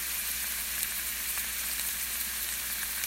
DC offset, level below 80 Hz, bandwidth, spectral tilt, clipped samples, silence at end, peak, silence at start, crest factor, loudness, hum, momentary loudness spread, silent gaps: under 0.1%; -52 dBFS; 16 kHz; 1 dB/octave; under 0.1%; 0 s; -8 dBFS; 0 s; 24 dB; -30 LUFS; none; 1 LU; none